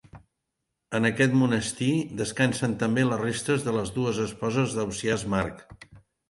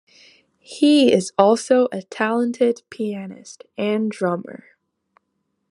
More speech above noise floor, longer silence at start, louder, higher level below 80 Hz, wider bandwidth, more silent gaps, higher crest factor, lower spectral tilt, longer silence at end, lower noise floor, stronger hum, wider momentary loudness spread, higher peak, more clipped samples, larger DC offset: about the same, 56 dB vs 54 dB; second, 0.15 s vs 0.7 s; second, -26 LUFS vs -19 LUFS; first, -54 dBFS vs -72 dBFS; about the same, 11.5 kHz vs 11.5 kHz; neither; about the same, 18 dB vs 20 dB; about the same, -5.5 dB/octave vs -5 dB/octave; second, 0.3 s vs 1.15 s; first, -82 dBFS vs -73 dBFS; neither; second, 6 LU vs 21 LU; second, -10 dBFS vs 0 dBFS; neither; neither